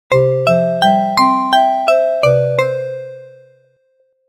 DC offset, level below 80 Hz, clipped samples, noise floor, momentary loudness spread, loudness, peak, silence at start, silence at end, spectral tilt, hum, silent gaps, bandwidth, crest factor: under 0.1%; -52 dBFS; under 0.1%; -59 dBFS; 10 LU; -13 LUFS; -2 dBFS; 0.1 s; 1 s; -6 dB/octave; none; none; 16 kHz; 12 dB